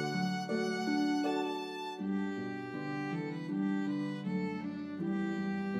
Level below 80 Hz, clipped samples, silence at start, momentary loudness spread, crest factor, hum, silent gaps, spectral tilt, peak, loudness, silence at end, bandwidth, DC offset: -82 dBFS; under 0.1%; 0 s; 7 LU; 14 dB; none; none; -6.5 dB/octave; -22 dBFS; -36 LUFS; 0 s; 12.5 kHz; under 0.1%